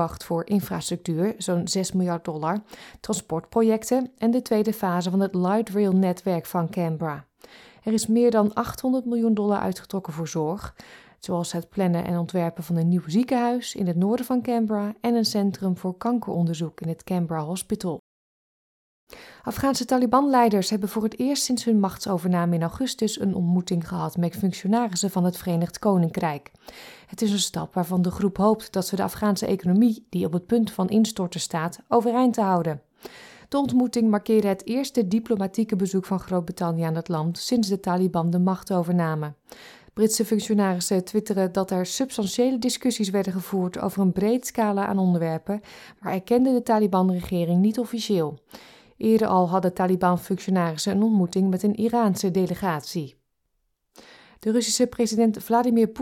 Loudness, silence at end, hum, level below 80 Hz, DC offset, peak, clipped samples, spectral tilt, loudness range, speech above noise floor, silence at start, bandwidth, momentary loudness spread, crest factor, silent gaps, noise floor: -24 LUFS; 0 s; none; -58 dBFS; under 0.1%; -6 dBFS; under 0.1%; -6 dB/octave; 3 LU; 50 dB; 0 s; 17.5 kHz; 8 LU; 18 dB; 17.99-19.07 s; -74 dBFS